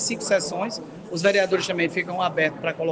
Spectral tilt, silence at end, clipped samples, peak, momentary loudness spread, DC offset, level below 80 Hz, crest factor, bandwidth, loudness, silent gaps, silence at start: -3.5 dB/octave; 0 s; under 0.1%; -6 dBFS; 9 LU; under 0.1%; -66 dBFS; 18 dB; 10 kHz; -23 LUFS; none; 0 s